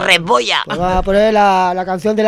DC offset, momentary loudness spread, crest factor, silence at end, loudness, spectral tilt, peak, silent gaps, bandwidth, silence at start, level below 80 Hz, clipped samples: under 0.1%; 6 LU; 14 dB; 0 s; -13 LUFS; -4 dB/octave; 0 dBFS; none; 18 kHz; 0 s; -30 dBFS; under 0.1%